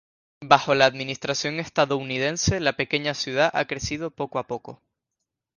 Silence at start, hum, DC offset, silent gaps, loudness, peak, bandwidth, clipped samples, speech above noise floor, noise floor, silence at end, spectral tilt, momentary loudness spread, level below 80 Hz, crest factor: 0.4 s; none; under 0.1%; none; -23 LUFS; 0 dBFS; 10.5 kHz; under 0.1%; 59 dB; -83 dBFS; 0.85 s; -3.5 dB/octave; 10 LU; -50 dBFS; 24 dB